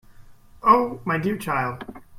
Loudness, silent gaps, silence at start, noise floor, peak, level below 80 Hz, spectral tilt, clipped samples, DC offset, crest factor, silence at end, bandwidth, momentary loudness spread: -22 LUFS; none; 0.2 s; -46 dBFS; -4 dBFS; -52 dBFS; -6.5 dB/octave; under 0.1%; under 0.1%; 20 dB; 0 s; 16 kHz; 10 LU